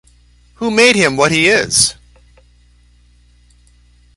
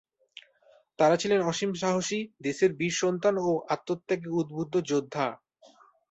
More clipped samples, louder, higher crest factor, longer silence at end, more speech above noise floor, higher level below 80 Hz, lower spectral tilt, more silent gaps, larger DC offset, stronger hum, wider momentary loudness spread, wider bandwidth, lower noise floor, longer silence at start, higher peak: neither; first, -11 LUFS vs -28 LUFS; about the same, 16 dB vs 18 dB; first, 2.25 s vs 0.75 s; about the same, 37 dB vs 35 dB; first, -46 dBFS vs -70 dBFS; second, -2.5 dB/octave vs -4.5 dB/octave; neither; neither; first, 60 Hz at -45 dBFS vs none; about the same, 6 LU vs 7 LU; first, 12 kHz vs 8.2 kHz; second, -49 dBFS vs -62 dBFS; second, 0.6 s vs 1 s; first, 0 dBFS vs -10 dBFS